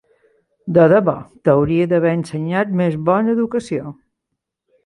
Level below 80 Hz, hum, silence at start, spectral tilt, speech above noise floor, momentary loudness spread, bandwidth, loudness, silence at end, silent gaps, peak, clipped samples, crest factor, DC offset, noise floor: -52 dBFS; none; 0.65 s; -8.5 dB/octave; 62 dB; 12 LU; 11 kHz; -17 LUFS; 0.9 s; none; -2 dBFS; under 0.1%; 16 dB; under 0.1%; -78 dBFS